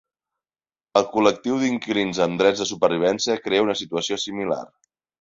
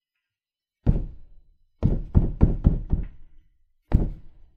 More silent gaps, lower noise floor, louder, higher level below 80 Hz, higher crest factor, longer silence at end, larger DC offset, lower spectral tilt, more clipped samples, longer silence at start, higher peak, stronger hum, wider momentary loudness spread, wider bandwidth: neither; about the same, under -90 dBFS vs under -90 dBFS; first, -22 LUFS vs -26 LUFS; second, -62 dBFS vs -28 dBFS; about the same, 20 dB vs 24 dB; first, 0.55 s vs 0.25 s; neither; second, -4 dB/octave vs -11.5 dB/octave; neither; about the same, 0.95 s vs 0.85 s; about the same, -2 dBFS vs 0 dBFS; neither; second, 6 LU vs 14 LU; first, 7.8 kHz vs 3.2 kHz